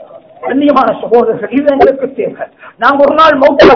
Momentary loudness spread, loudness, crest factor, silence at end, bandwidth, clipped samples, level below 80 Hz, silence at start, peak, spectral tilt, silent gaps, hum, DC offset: 13 LU; -9 LUFS; 8 dB; 0 s; 5.4 kHz; 5%; -40 dBFS; 0 s; 0 dBFS; -6 dB/octave; none; none; under 0.1%